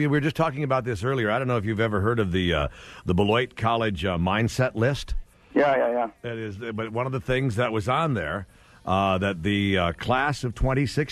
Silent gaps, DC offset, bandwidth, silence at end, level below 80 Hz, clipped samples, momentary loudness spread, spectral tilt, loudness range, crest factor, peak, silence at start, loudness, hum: none; under 0.1%; 13.5 kHz; 0 s; -40 dBFS; under 0.1%; 9 LU; -6.5 dB/octave; 2 LU; 16 dB; -8 dBFS; 0 s; -25 LUFS; none